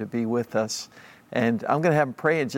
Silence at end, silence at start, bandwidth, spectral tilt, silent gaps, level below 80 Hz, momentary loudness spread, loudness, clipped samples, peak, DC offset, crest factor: 0 s; 0 s; 16.5 kHz; -5.5 dB/octave; none; -68 dBFS; 9 LU; -25 LUFS; under 0.1%; -8 dBFS; under 0.1%; 18 dB